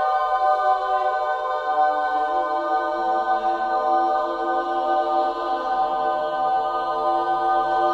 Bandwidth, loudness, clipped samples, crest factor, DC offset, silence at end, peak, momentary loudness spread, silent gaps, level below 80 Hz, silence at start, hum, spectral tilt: 7.6 kHz; -22 LUFS; under 0.1%; 12 dB; under 0.1%; 0 s; -8 dBFS; 3 LU; none; -56 dBFS; 0 s; none; -4.5 dB/octave